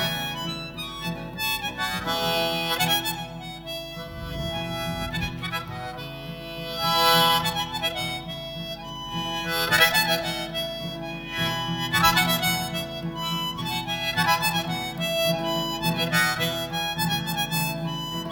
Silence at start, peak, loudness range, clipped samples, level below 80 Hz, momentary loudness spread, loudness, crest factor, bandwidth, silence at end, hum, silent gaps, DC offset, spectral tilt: 0 s; -4 dBFS; 5 LU; under 0.1%; -48 dBFS; 14 LU; -25 LUFS; 22 dB; 19 kHz; 0 s; none; none; under 0.1%; -3 dB/octave